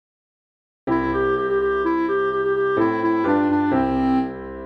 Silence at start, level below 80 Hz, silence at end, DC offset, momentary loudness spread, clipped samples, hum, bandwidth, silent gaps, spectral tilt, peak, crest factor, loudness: 0.85 s; -44 dBFS; 0 s; under 0.1%; 4 LU; under 0.1%; none; 6 kHz; none; -8.5 dB/octave; -8 dBFS; 12 dB; -21 LUFS